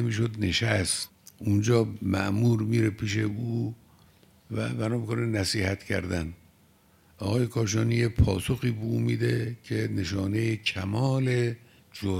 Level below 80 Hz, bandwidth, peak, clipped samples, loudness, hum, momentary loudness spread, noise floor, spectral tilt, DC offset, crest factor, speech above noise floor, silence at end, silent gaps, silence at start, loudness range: -46 dBFS; 15 kHz; -8 dBFS; under 0.1%; -27 LUFS; none; 8 LU; -61 dBFS; -5.5 dB/octave; under 0.1%; 20 dB; 34 dB; 0 s; none; 0 s; 4 LU